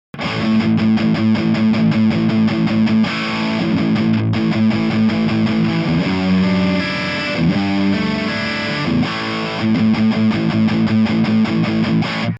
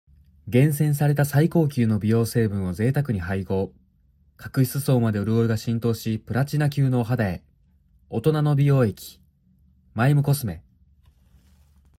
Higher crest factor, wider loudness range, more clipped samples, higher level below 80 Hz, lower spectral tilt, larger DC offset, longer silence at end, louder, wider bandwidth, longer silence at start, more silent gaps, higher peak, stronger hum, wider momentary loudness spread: about the same, 12 dB vs 16 dB; about the same, 2 LU vs 3 LU; neither; first, -44 dBFS vs -54 dBFS; about the same, -7 dB/octave vs -7.5 dB/octave; neither; second, 0 s vs 1.4 s; first, -16 LUFS vs -23 LUFS; second, 7.8 kHz vs 16 kHz; second, 0.15 s vs 0.45 s; neither; about the same, -4 dBFS vs -6 dBFS; neither; second, 4 LU vs 10 LU